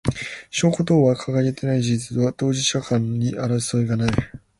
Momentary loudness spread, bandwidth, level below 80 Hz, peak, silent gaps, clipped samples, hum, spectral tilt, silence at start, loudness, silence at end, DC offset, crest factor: 6 LU; 11.5 kHz; -44 dBFS; -2 dBFS; none; under 0.1%; none; -5.5 dB/octave; 0.05 s; -21 LUFS; 0.2 s; under 0.1%; 18 dB